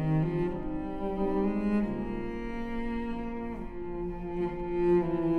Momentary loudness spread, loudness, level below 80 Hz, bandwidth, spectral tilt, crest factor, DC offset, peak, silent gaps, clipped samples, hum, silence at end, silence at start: 10 LU; -32 LUFS; -42 dBFS; 5.2 kHz; -10 dB/octave; 14 dB; under 0.1%; -16 dBFS; none; under 0.1%; none; 0 s; 0 s